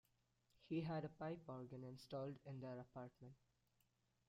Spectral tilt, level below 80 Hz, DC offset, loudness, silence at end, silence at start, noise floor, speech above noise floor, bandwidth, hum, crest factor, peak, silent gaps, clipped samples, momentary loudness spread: -8 dB/octave; -82 dBFS; under 0.1%; -52 LUFS; 0.95 s; 0.6 s; -84 dBFS; 33 dB; 14.5 kHz; none; 18 dB; -36 dBFS; none; under 0.1%; 11 LU